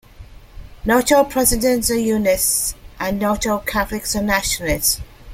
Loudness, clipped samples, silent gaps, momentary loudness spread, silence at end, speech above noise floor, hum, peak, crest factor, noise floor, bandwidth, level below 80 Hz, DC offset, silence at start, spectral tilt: -18 LUFS; under 0.1%; none; 8 LU; 0 s; 22 dB; none; 0 dBFS; 18 dB; -40 dBFS; 16.5 kHz; -34 dBFS; under 0.1%; 0.2 s; -3 dB/octave